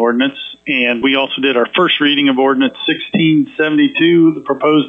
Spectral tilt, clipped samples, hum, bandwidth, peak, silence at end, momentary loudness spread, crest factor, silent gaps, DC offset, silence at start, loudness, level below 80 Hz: -8 dB/octave; under 0.1%; none; 5.2 kHz; -2 dBFS; 0 s; 5 LU; 10 dB; none; under 0.1%; 0 s; -13 LUFS; -60 dBFS